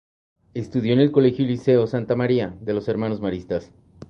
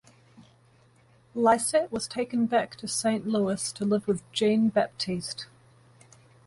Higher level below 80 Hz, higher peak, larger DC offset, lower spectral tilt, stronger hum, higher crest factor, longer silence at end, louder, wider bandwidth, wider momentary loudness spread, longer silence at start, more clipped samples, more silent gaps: first, -52 dBFS vs -64 dBFS; first, -4 dBFS vs -10 dBFS; neither; first, -8.5 dB/octave vs -4.5 dB/octave; neither; about the same, 18 dB vs 20 dB; second, 0.05 s vs 1 s; first, -21 LUFS vs -27 LUFS; second, 6.8 kHz vs 11.5 kHz; first, 12 LU vs 9 LU; first, 0.55 s vs 0.4 s; neither; neither